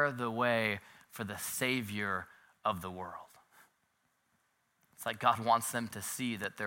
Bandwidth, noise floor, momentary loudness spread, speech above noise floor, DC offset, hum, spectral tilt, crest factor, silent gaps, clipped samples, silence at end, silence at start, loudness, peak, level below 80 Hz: 17 kHz; -77 dBFS; 14 LU; 43 dB; under 0.1%; none; -3.5 dB/octave; 24 dB; none; under 0.1%; 0 s; 0 s; -34 LUFS; -12 dBFS; -76 dBFS